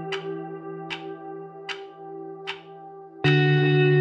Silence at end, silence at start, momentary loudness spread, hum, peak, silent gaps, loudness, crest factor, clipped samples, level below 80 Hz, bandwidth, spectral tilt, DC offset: 0 s; 0 s; 20 LU; none; -8 dBFS; none; -25 LUFS; 18 dB; under 0.1%; -66 dBFS; 7.4 kHz; -7.5 dB/octave; under 0.1%